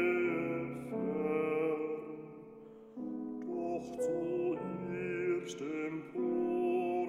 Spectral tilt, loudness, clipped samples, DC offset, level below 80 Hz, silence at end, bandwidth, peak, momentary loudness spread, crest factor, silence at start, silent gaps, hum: -7 dB/octave; -36 LUFS; under 0.1%; under 0.1%; -72 dBFS; 0 s; 11.5 kHz; -22 dBFS; 13 LU; 14 dB; 0 s; none; none